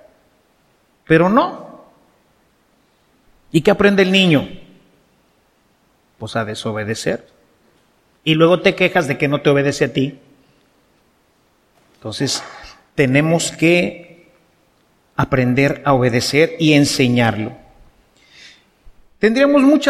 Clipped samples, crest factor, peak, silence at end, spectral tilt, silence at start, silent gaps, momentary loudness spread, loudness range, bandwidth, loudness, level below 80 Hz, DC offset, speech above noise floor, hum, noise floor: under 0.1%; 18 dB; 0 dBFS; 0 s; -5.5 dB/octave; 1.1 s; none; 15 LU; 8 LU; 15 kHz; -16 LUFS; -48 dBFS; under 0.1%; 44 dB; none; -59 dBFS